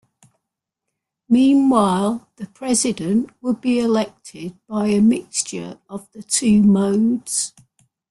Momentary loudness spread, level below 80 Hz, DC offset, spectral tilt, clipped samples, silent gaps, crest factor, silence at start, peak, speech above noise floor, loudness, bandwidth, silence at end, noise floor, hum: 19 LU; -56 dBFS; under 0.1%; -5 dB/octave; under 0.1%; none; 18 dB; 1.3 s; -2 dBFS; 63 dB; -18 LUFS; 12.5 kHz; 0.6 s; -82 dBFS; none